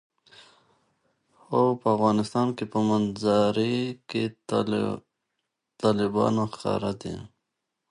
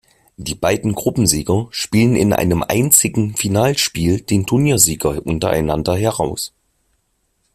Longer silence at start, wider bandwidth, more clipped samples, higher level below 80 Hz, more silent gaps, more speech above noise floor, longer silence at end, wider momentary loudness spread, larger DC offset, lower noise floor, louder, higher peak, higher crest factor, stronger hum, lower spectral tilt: first, 1.5 s vs 0.4 s; second, 11 kHz vs 16 kHz; neither; second, -60 dBFS vs -40 dBFS; neither; first, 57 dB vs 50 dB; second, 0.65 s vs 1.05 s; about the same, 8 LU vs 9 LU; neither; first, -82 dBFS vs -66 dBFS; second, -26 LUFS vs -16 LUFS; second, -8 dBFS vs 0 dBFS; about the same, 18 dB vs 18 dB; neither; first, -6.5 dB/octave vs -4.5 dB/octave